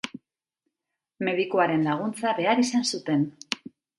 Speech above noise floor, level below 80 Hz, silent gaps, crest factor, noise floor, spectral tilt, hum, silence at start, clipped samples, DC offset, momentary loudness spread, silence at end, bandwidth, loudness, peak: 61 dB; -72 dBFS; none; 22 dB; -85 dBFS; -4.5 dB/octave; none; 0.05 s; under 0.1%; under 0.1%; 11 LU; 0.4 s; 11.5 kHz; -25 LUFS; -6 dBFS